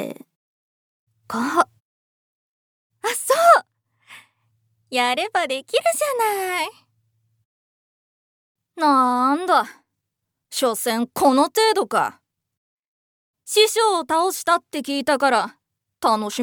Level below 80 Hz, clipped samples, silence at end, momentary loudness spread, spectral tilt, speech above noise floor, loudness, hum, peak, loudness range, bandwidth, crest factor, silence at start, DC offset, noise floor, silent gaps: -74 dBFS; under 0.1%; 0 s; 10 LU; -2 dB/octave; 61 dB; -20 LUFS; none; -2 dBFS; 4 LU; over 20 kHz; 22 dB; 0 s; under 0.1%; -80 dBFS; 0.36-1.07 s, 1.80-2.90 s, 7.45-8.55 s, 12.57-13.34 s